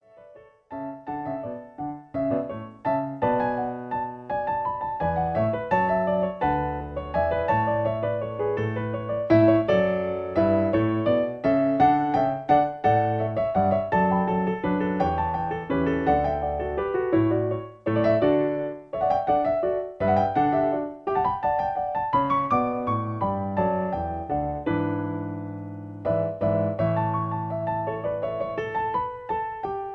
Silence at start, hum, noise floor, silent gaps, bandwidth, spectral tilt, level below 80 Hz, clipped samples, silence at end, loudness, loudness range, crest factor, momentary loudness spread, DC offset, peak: 0.2 s; none; -50 dBFS; none; 6.2 kHz; -9.5 dB/octave; -48 dBFS; under 0.1%; 0 s; -25 LUFS; 5 LU; 16 dB; 9 LU; under 0.1%; -8 dBFS